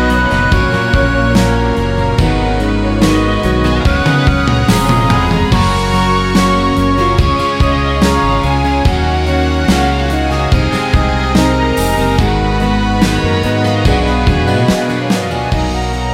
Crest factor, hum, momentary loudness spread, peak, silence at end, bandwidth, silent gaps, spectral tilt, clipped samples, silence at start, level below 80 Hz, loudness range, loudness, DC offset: 12 dB; none; 3 LU; 0 dBFS; 0 s; 16 kHz; none; -6 dB/octave; under 0.1%; 0 s; -18 dBFS; 1 LU; -13 LUFS; under 0.1%